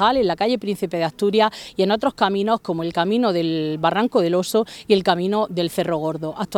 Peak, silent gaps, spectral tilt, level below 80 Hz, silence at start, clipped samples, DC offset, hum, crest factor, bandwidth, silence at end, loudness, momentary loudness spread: -2 dBFS; none; -5.5 dB/octave; -56 dBFS; 0 s; under 0.1%; under 0.1%; none; 18 dB; 17.5 kHz; 0 s; -20 LUFS; 5 LU